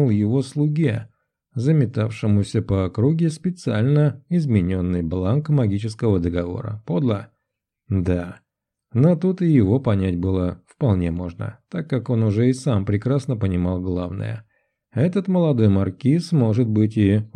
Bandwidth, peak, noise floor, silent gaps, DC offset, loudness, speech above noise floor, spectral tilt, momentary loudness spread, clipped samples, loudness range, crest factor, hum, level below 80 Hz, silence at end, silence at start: 10 kHz; -4 dBFS; -79 dBFS; none; under 0.1%; -21 LUFS; 60 dB; -8.5 dB/octave; 10 LU; under 0.1%; 2 LU; 16 dB; none; -46 dBFS; 0.1 s; 0 s